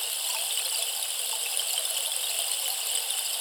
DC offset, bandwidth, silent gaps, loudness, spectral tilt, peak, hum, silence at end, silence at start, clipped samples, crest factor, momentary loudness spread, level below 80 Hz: under 0.1%; over 20 kHz; none; -26 LUFS; 5.5 dB/octave; -10 dBFS; none; 0 s; 0 s; under 0.1%; 20 dB; 1 LU; -84 dBFS